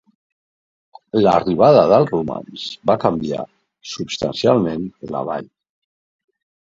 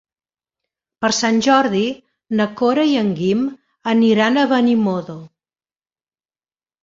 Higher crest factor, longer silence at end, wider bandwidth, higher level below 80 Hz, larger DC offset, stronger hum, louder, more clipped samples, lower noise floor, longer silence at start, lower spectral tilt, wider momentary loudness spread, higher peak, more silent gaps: about the same, 18 dB vs 16 dB; second, 1.3 s vs 1.55 s; about the same, 7.8 kHz vs 7.8 kHz; first, -52 dBFS vs -60 dBFS; neither; neither; about the same, -17 LUFS vs -17 LUFS; neither; about the same, under -90 dBFS vs under -90 dBFS; first, 1.15 s vs 1 s; first, -6.5 dB/octave vs -4.5 dB/octave; first, 17 LU vs 12 LU; about the same, 0 dBFS vs -2 dBFS; neither